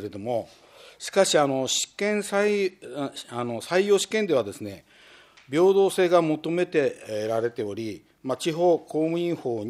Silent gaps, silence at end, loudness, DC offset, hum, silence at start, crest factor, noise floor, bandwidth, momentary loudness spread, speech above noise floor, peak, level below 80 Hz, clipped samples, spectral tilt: none; 0 s; -25 LUFS; under 0.1%; none; 0 s; 18 dB; -53 dBFS; 14 kHz; 13 LU; 28 dB; -6 dBFS; -70 dBFS; under 0.1%; -4 dB/octave